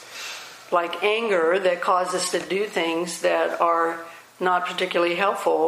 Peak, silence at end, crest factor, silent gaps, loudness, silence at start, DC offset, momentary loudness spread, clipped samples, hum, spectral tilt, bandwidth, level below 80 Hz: -6 dBFS; 0 s; 18 dB; none; -22 LUFS; 0 s; under 0.1%; 11 LU; under 0.1%; none; -3 dB/octave; 15.5 kHz; -76 dBFS